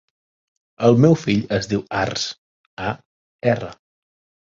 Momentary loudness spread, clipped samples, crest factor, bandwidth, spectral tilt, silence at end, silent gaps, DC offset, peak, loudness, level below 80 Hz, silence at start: 15 LU; under 0.1%; 20 dB; 7.8 kHz; -6 dB/octave; 0.7 s; 2.38-2.77 s, 3.05-3.39 s; under 0.1%; -2 dBFS; -20 LUFS; -50 dBFS; 0.8 s